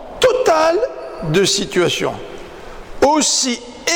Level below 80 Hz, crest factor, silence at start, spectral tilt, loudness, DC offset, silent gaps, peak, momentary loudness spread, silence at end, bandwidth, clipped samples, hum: -42 dBFS; 12 dB; 0 s; -3 dB/octave; -16 LUFS; under 0.1%; none; -6 dBFS; 20 LU; 0 s; 19 kHz; under 0.1%; none